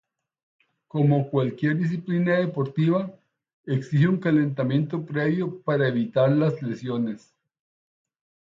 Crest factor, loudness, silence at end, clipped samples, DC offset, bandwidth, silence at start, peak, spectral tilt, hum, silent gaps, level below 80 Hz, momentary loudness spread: 16 dB; -24 LUFS; 1.35 s; under 0.1%; under 0.1%; 7.4 kHz; 0.95 s; -8 dBFS; -9 dB/octave; none; 3.53-3.64 s; -68 dBFS; 8 LU